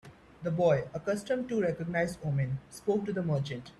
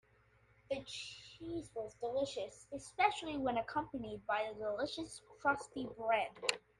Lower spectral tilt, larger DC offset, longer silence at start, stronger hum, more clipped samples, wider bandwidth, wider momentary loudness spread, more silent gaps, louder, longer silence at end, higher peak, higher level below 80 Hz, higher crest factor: first, -7 dB/octave vs -3.5 dB/octave; neither; second, 0.05 s vs 0.7 s; second, none vs 60 Hz at -65 dBFS; neither; about the same, 13 kHz vs 12.5 kHz; second, 8 LU vs 12 LU; neither; first, -32 LUFS vs -40 LUFS; second, 0.05 s vs 0.2 s; about the same, -14 dBFS vs -14 dBFS; first, -60 dBFS vs -68 dBFS; second, 16 dB vs 26 dB